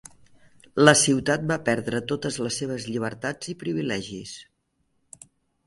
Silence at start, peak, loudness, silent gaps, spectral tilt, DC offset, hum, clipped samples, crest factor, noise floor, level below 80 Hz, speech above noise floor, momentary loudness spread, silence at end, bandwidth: 0.05 s; 0 dBFS; -24 LUFS; none; -3.5 dB/octave; under 0.1%; none; under 0.1%; 24 dB; -72 dBFS; -60 dBFS; 48 dB; 16 LU; 1.25 s; 11.5 kHz